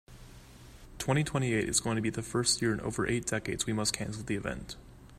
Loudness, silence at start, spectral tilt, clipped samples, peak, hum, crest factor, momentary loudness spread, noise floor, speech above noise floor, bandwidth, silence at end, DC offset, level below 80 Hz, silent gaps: -31 LUFS; 0.1 s; -4 dB/octave; under 0.1%; -12 dBFS; none; 22 dB; 10 LU; -52 dBFS; 20 dB; 15.5 kHz; 0 s; under 0.1%; -52 dBFS; none